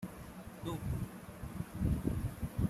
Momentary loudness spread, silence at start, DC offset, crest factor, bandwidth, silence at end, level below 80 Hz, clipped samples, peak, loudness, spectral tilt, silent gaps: 12 LU; 0 s; under 0.1%; 18 dB; 15.5 kHz; 0 s; -46 dBFS; under 0.1%; -20 dBFS; -40 LUFS; -7.5 dB/octave; none